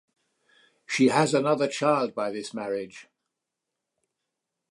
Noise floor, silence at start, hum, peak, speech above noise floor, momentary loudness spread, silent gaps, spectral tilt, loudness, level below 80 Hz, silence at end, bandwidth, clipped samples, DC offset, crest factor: -85 dBFS; 0.9 s; none; -8 dBFS; 60 dB; 12 LU; none; -5 dB/octave; -25 LUFS; -76 dBFS; 1.7 s; 11.5 kHz; under 0.1%; under 0.1%; 20 dB